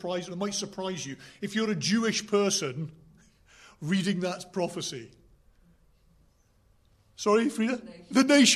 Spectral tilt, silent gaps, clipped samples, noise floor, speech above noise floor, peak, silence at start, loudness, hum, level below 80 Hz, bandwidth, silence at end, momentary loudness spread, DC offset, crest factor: -3.5 dB/octave; none; under 0.1%; -64 dBFS; 37 dB; -10 dBFS; 0 s; -28 LUFS; none; -66 dBFS; 13.5 kHz; 0 s; 13 LU; under 0.1%; 20 dB